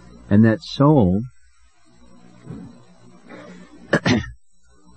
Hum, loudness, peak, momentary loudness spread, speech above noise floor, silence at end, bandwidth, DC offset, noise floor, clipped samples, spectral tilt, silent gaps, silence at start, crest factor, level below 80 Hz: none; -18 LUFS; -2 dBFS; 24 LU; 42 dB; 0.65 s; 8.6 kHz; 0.3%; -57 dBFS; under 0.1%; -7 dB/octave; none; 0.3 s; 18 dB; -48 dBFS